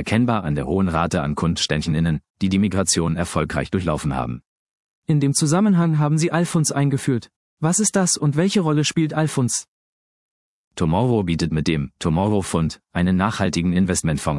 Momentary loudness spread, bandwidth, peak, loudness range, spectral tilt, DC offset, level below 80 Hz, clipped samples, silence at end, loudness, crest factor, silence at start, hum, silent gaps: 6 LU; 12 kHz; -2 dBFS; 3 LU; -5 dB/octave; under 0.1%; -44 dBFS; under 0.1%; 0 s; -20 LUFS; 18 dB; 0 s; none; 2.30-2.34 s, 4.46-5.02 s, 7.36-7.57 s, 9.68-10.71 s